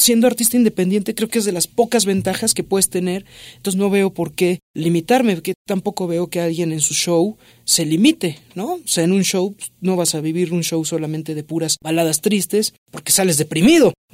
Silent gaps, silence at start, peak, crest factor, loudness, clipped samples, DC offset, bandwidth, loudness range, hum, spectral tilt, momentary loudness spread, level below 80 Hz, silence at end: 4.62-4.74 s, 5.55-5.65 s, 12.78-12.86 s; 0 s; -2 dBFS; 16 dB; -18 LUFS; under 0.1%; under 0.1%; 16 kHz; 3 LU; none; -4 dB/octave; 10 LU; -54 dBFS; 0.2 s